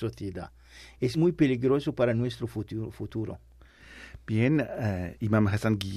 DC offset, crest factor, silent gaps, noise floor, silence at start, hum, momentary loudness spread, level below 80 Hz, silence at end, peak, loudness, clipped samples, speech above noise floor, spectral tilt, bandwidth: under 0.1%; 16 dB; none; -51 dBFS; 0 s; none; 17 LU; -54 dBFS; 0 s; -12 dBFS; -28 LUFS; under 0.1%; 24 dB; -7.5 dB/octave; 14 kHz